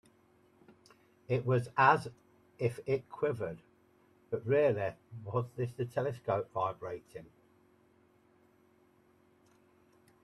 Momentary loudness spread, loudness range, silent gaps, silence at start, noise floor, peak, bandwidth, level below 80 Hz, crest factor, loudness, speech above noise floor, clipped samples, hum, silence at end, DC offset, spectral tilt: 18 LU; 8 LU; none; 1.3 s; -67 dBFS; -10 dBFS; 12.5 kHz; -72 dBFS; 26 dB; -33 LUFS; 34 dB; under 0.1%; none; 3 s; under 0.1%; -7.5 dB/octave